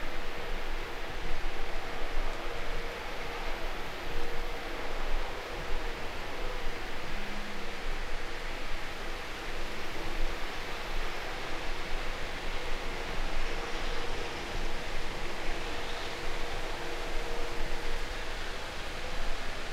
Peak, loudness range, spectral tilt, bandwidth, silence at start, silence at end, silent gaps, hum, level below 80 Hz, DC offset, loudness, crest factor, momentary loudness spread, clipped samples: -16 dBFS; 2 LU; -3.5 dB/octave; 13.5 kHz; 0 s; 0 s; none; none; -34 dBFS; under 0.1%; -38 LUFS; 14 dB; 2 LU; under 0.1%